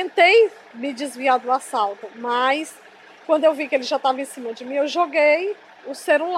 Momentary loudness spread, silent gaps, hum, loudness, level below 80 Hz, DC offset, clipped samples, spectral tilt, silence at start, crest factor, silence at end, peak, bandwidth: 15 LU; none; none; -20 LUFS; -86 dBFS; under 0.1%; under 0.1%; -1.5 dB/octave; 0 s; 16 dB; 0 s; -4 dBFS; 14 kHz